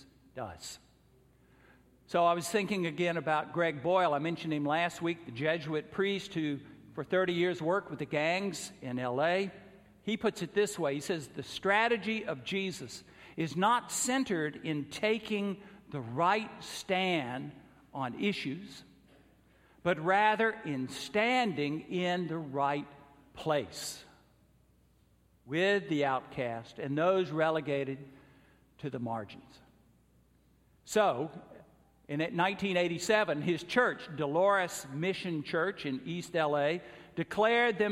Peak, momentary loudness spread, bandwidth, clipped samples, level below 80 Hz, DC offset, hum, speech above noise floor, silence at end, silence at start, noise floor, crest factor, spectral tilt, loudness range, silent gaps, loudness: -12 dBFS; 14 LU; 16 kHz; under 0.1%; -70 dBFS; under 0.1%; none; 35 dB; 0 s; 0.35 s; -67 dBFS; 20 dB; -4.5 dB/octave; 6 LU; none; -32 LUFS